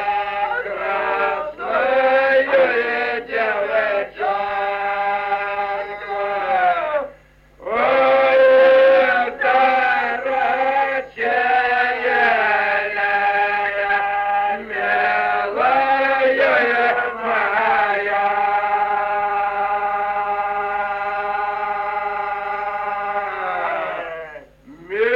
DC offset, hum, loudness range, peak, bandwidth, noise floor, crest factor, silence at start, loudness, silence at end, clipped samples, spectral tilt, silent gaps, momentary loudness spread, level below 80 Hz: under 0.1%; none; 7 LU; -4 dBFS; 5.8 kHz; -48 dBFS; 14 dB; 0 s; -18 LUFS; 0 s; under 0.1%; -4.5 dB/octave; none; 9 LU; -54 dBFS